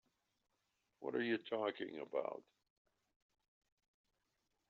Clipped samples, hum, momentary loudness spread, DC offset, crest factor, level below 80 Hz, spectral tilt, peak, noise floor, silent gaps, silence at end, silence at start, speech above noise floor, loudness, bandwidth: under 0.1%; none; 10 LU; under 0.1%; 22 dB; under -90 dBFS; -3 dB/octave; -26 dBFS; -86 dBFS; none; 2.3 s; 1 s; 44 dB; -43 LUFS; 6.8 kHz